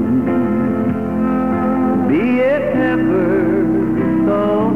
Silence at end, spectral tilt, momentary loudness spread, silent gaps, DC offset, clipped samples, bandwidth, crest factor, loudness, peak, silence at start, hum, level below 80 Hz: 0 s; -9.5 dB/octave; 2 LU; none; 0.9%; under 0.1%; 4.7 kHz; 10 dB; -16 LUFS; -6 dBFS; 0 s; none; -42 dBFS